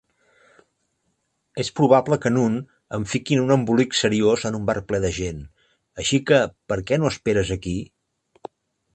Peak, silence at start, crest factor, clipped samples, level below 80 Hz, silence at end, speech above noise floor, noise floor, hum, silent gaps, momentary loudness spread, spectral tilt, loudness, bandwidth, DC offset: 0 dBFS; 1.55 s; 22 dB; under 0.1%; -46 dBFS; 1.1 s; 51 dB; -72 dBFS; none; none; 19 LU; -5.5 dB/octave; -21 LUFS; 9 kHz; under 0.1%